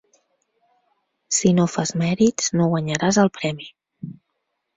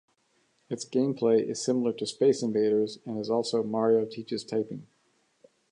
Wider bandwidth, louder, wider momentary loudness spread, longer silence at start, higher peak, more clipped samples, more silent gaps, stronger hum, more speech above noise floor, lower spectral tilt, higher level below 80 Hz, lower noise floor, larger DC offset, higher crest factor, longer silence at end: second, 8 kHz vs 11 kHz; first, -20 LUFS vs -28 LUFS; first, 20 LU vs 10 LU; first, 1.3 s vs 0.7 s; first, -2 dBFS vs -12 dBFS; neither; neither; neither; first, 56 dB vs 43 dB; about the same, -5 dB/octave vs -5.5 dB/octave; first, -58 dBFS vs -76 dBFS; first, -76 dBFS vs -70 dBFS; neither; about the same, 20 dB vs 16 dB; second, 0.65 s vs 0.9 s